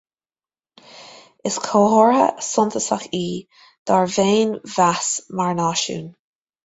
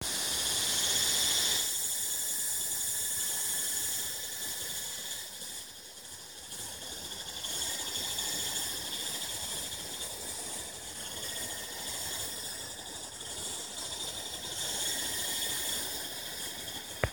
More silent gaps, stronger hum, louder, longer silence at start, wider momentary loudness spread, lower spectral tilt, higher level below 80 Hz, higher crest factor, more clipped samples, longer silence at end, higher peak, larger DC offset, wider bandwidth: first, 3.78-3.86 s vs none; neither; first, -19 LUFS vs -32 LUFS; first, 0.95 s vs 0 s; about the same, 14 LU vs 12 LU; first, -4 dB/octave vs 0 dB/octave; about the same, -62 dBFS vs -58 dBFS; second, 18 dB vs 26 dB; neither; first, 0.55 s vs 0 s; first, -2 dBFS vs -10 dBFS; neither; second, 8.2 kHz vs over 20 kHz